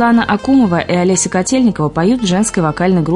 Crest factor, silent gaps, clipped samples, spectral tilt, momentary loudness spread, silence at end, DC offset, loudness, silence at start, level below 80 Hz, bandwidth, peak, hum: 10 dB; none; under 0.1%; -5 dB/octave; 3 LU; 0 s; under 0.1%; -13 LUFS; 0 s; -40 dBFS; 11 kHz; -2 dBFS; none